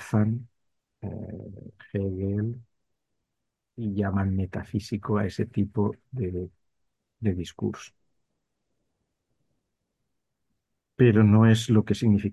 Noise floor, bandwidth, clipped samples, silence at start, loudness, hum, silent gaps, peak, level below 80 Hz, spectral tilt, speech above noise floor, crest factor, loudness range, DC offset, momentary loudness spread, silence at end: -83 dBFS; 12 kHz; under 0.1%; 0 s; -26 LUFS; none; none; -6 dBFS; -48 dBFS; -7.5 dB/octave; 58 dB; 20 dB; 12 LU; under 0.1%; 20 LU; 0 s